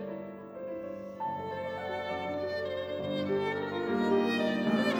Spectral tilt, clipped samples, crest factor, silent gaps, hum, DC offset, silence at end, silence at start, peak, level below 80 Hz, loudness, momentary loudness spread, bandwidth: -6.5 dB/octave; under 0.1%; 16 dB; none; none; under 0.1%; 0 s; 0 s; -18 dBFS; -70 dBFS; -33 LUFS; 12 LU; over 20 kHz